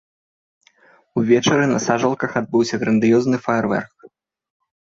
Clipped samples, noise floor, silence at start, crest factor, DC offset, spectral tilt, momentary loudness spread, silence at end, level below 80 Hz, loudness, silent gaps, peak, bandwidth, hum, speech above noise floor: under 0.1%; -54 dBFS; 1.15 s; 16 dB; under 0.1%; -5.5 dB/octave; 8 LU; 0.75 s; -58 dBFS; -18 LUFS; none; -4 dBFS; 7.8 kHz; none; 37 dB